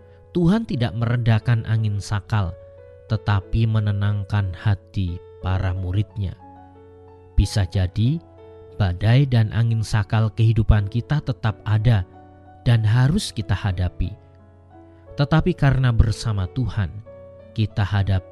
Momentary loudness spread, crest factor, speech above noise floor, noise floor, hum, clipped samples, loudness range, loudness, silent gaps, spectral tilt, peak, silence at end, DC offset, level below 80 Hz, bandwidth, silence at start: 10 LU; 20 dB; 28 dB; -48 dBFS; none; under 0.1%; 5 LU; -22 LUFS; none; -7 dB/octave; 0 dBFS; 0 s; under 0.1%; -34 dBFS; 11.5 kHz; 0.35 s